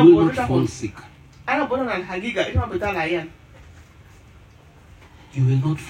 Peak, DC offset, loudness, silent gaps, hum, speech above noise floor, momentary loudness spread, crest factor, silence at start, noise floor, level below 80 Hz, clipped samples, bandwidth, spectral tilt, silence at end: -2 dBFS; under 0.1%; -22 LUFS; none; none; 29 dB; 15 LU; 20 dB; 0 s; -48 dBFS; -44 dBFS; under 0.1%; 9.8 kHz; -7 dB/octave; 0 s